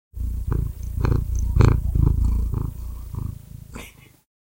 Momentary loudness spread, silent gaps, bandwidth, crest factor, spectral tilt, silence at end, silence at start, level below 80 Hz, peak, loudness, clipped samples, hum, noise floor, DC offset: 21 LU; none; 16.5 kHz; 20 dB; -8 dB/octave; 0.6 s; 0.15 s; -26 dBFS; -2 dBFS; -24 LUFS; under 0.1%; none; -43 dBFS; under 0.1%